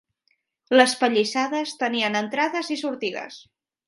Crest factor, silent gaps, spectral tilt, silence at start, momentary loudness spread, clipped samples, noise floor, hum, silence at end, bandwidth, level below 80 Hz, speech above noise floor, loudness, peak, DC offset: 22 dB; none; -3 dB/octave; 0.7 s; 11 LU; under 0.1%; -71 dBFS; none; 0.5 s; 11.5 kHz; -76 dBFS; 48 dB; -22 LUFS; -2 dBFS; under 0.1%